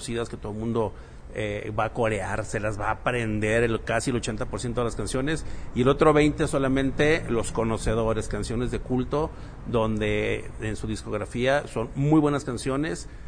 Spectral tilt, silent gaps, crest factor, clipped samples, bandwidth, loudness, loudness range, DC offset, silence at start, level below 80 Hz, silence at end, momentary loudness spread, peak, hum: -6 dB/octave; none; 20 dB; under 0.1%; 10.5 kHz; -26 LUFS; 4 LU; under 0.1%; 0 s; -38 dBFS; 0 s; 10 LU; -6 dBFS; none